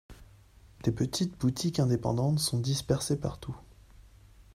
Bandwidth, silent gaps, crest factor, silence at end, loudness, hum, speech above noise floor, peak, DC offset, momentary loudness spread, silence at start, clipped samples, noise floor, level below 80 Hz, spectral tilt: 15.5 kHz; none; 20 dB; 0.15 s; -30 LUFS; none; 27 dB; -12 dBFS; under 0.1%; 9 LU; 0.1 s; under 0.1%; -56 dBFS; -52 dBFS; -5.5 dB/octave